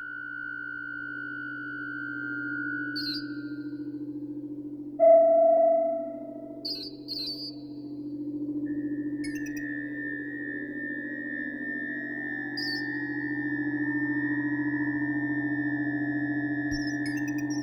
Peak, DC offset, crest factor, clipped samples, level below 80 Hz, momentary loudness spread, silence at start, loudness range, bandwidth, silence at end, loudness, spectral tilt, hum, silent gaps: -10 dBFS; under 0.1%; 20 dB; under 0.1%; -62 dBFS; 13 LU; 0 s; 9 LU; 16 kHz; 0 s; -29 LUFS; -5.5 dB/octave; none; none